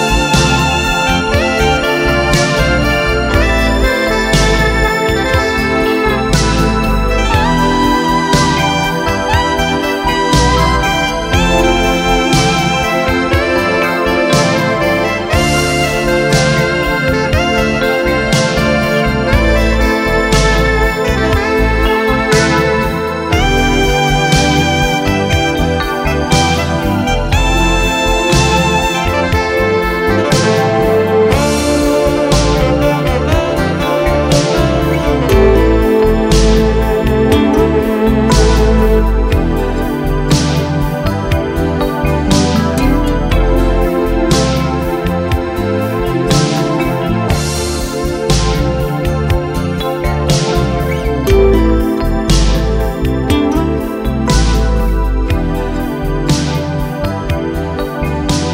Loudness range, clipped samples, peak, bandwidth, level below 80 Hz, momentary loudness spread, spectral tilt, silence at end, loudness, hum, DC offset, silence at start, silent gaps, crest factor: 3 LU; under 0.1%; 0 dBFS; 16.5 kHz; -18 dBFS; 5 LU; -5 dB/octave; 0 s; -12 LUFS; none; under 0.1%; 0 s; none; 12 dB